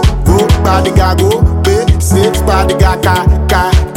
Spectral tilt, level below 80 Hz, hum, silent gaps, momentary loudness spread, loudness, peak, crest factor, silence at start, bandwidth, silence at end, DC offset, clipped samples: -5.5 dB/octave; -14 dBFS; none; none; 1 LU; -10 LUFS; 0 dBFS; 8 dB; 0 s; 16.5 kHz; 0 s; under 0.1%; under 0.1%